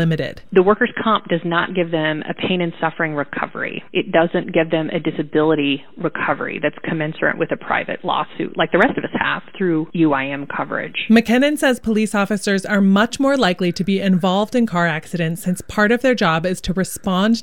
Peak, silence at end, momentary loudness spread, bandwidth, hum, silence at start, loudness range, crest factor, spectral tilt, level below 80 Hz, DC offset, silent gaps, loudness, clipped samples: -2 dBFS; 0 s; 8 LU; 16.5 kHz; none; 0 s; 3 LU; 16 dB; -5.5 dB/octave; -48 dBFS; 1%; none; -18 LUFS; under 0.1%